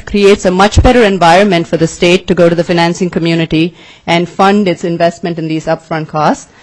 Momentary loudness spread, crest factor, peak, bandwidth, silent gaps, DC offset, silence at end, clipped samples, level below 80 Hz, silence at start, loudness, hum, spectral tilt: 9 LU; 10 dB; 0 dBFS; 11 kHz; none; under 0.1%; 0.2 s; 0.2%; -26 dBFS; 0.05 s; -10 LUFS; none; -5.5 dB/octave